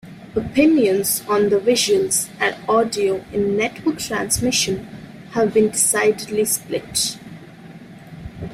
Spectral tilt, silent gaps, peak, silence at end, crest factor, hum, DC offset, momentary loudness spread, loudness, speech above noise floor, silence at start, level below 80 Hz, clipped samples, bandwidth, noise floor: -3 dB/octave; none; -4 dBFS; 0 s; 16 dB; none; under 0.1%; 12 LU; -19 LUFS; 21 dB; 0.05 s; -48 dBFS; under 0.1%; 16 kHz; -40 dBFS